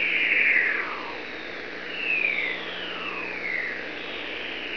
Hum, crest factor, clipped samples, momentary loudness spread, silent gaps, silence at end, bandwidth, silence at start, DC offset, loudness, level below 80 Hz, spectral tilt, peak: 60 Hz at -55 dBFS; 18 dB; under 0.1%; 14 LU; none; 0 s; 5.4 kHz; 0 s; 0.5%; -25 LUFS; -64 dBFS; -3.5 dB/octave; -10 dBFS